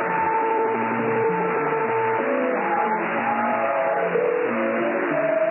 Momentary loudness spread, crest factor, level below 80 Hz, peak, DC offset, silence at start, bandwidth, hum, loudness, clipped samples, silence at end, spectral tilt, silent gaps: 1 LU; 10 dB; -76 dBFS; -12 dBFS; under 0.1%; 0 s; 3.1 kHz; none; -22 LUFS; under 0.1%; 0 s; -10.5 dB/octave; none